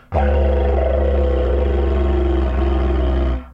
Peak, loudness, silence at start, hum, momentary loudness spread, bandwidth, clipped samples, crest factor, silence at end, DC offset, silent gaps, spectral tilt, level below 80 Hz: -6 dBFS; -18 LUFS; 0.1 s; none; 2 LU; 3.9 kHz; under 0.1%; 12 dB; 0 s; under 0.1%; none; -9.5 dB/octave; -18 dBFS